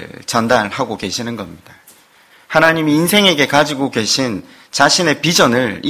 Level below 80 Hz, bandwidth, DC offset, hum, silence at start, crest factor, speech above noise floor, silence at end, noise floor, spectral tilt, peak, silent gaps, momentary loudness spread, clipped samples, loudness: -50 dBFS; 16 kHz; under 0.1%; none; 0 s; 16 dB; 33 dB; 0 s; -48 dBFS; -3.5 dB/octave; 0 dBFS; none; 12 LU; 0.3%; -14 LUFS